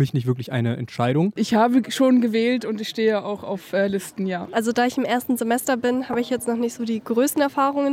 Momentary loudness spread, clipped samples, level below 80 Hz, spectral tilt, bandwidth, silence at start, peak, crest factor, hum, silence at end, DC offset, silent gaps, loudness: 8 LU; under 0.1%; -64 dBFS; -5.5 dB/octave; 16.5 kHz; 0 s; -8 dBFS; 14 dB; none; 0 s; under 0.1%; none; -22 LUFS